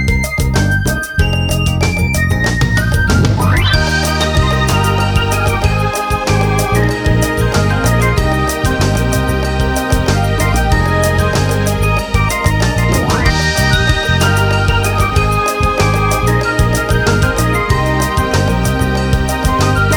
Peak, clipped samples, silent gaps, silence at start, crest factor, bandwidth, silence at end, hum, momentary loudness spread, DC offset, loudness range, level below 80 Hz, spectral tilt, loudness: 0 dBFS; under 0.1%; none; 0 s; 12 dB; 19.5 kHz; 0 s; none; 3 LU; under 0.1%; 1 LU; -20 dBFS; -5 dB/octave; -13 LUFS